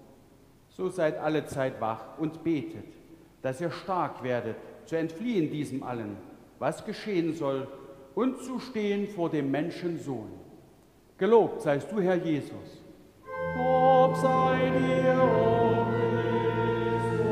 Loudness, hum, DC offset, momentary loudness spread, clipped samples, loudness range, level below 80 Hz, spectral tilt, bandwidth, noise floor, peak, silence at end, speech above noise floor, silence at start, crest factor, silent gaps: -28 LUFS; none; under 0.1%; 15 LU; under 0.1%; 8 LU; -60 dBFS; -7 dB/octave; 15 kHz; -58 dBFS; -8 dBFS; 0 s; 29 dB; 0.8 s; 20 dB; none